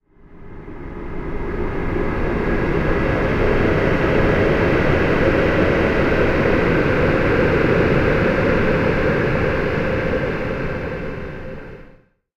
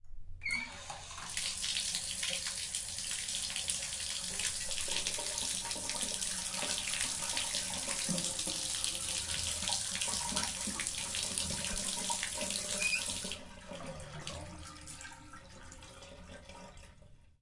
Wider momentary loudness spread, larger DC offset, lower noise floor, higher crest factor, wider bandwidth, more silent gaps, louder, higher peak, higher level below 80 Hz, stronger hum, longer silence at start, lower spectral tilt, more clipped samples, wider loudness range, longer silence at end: about the same, 14 LU vs 16 LU; neither; second, -49 dBFS vs -58 dBFS; second, 14 dB vs 24 dB; second, 8 kHz vs 12 kHz; neither; first, -18 LUFS vs -35 LUFS; first, -4 dBFS vs -14 dBFS; first, -28 dBFS vs -56 dBFS; neither; first, 0.25 s vs 0.05 s; first, -8 dB/octave vs -0.5 dB/octave; neither; second, 5 LU vs 9 LU; first, 0.5 s vs 0.1 s